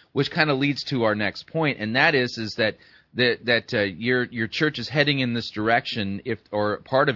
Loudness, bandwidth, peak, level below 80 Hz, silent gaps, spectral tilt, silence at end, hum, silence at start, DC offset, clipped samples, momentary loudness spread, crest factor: -23 LUFS; 6 kHz; -4 dBFS; -62 dBFS; none; -6 dB/octave; 0 s; none; 0.15 s; under 0.1%; under 0.1%; 7 LU; 20 dB